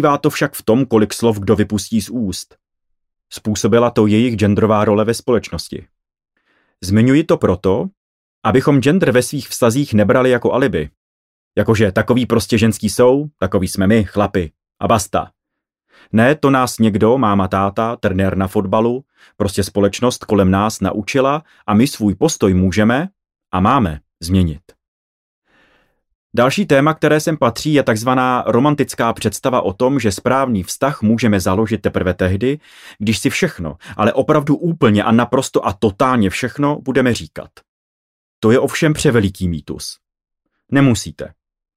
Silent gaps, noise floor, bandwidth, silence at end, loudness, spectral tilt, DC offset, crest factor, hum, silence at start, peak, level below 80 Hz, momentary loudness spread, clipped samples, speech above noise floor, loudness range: 7.97-8.42 s, 10.97-11.51 s, 24.88-25.42 s, 26.15-26.30 s, 37.69-38.42 s; -80 dBFS; 16 kHz; 0.5 s; -15 LUFS; -6 dB/octave; under 0.1%; 14 dB; none; 0 s; -2 dBFS; -44 dBFS; 10 LU; under 0.1%; 65 dB; 3 LU